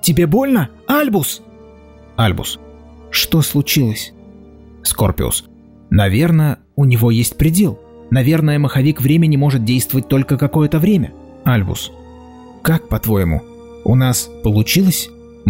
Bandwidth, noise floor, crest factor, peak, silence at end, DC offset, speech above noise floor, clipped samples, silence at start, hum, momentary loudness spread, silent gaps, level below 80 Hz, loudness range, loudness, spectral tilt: 16.5 kHz; -41 dBFS; 12 dB; -4 dBFS; 0 s; under 0.1%; 27 dB; under 0.1%; 0.05 s; none; 10 LU; none; -34 dBFS; 4 LU; -15 LUFS; -5.5 dB/octave